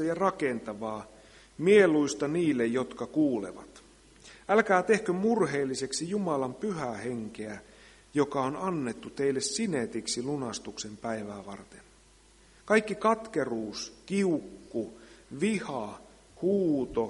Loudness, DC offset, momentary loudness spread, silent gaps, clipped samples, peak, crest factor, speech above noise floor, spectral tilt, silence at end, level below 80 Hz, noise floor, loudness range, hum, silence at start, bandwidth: -29 LUFS; under 0.1%; 16 LU; none; under 0.1%; -8 dBFS; 22 dB; 30 dB; -5 dB/octave; 0 s; -62 dBFS; -59 dBFS; 6 LU; none; 0 s; 11.5 kHz